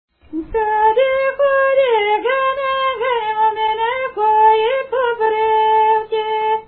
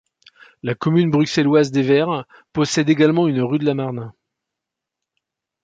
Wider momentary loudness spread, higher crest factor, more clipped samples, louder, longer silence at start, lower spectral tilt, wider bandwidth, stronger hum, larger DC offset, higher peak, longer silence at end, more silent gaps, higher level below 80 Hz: second, 6 LU vs 12 LU; about the same, 14 dB vs 18 dB; neither; about the same, -16 LUFS vs -18 LUFS; second, 0.3 s vs 0.65 s; first, -8 dB/octave vs -6 dB/octave; second, 4.5 kHz vs 9.2 kHz; neither; neither; about the same, -2 dBFS vs -2 dBFS; second, 0.05 s vs 1.55 s; neither; first, -50 dBFS vs -60 dBFS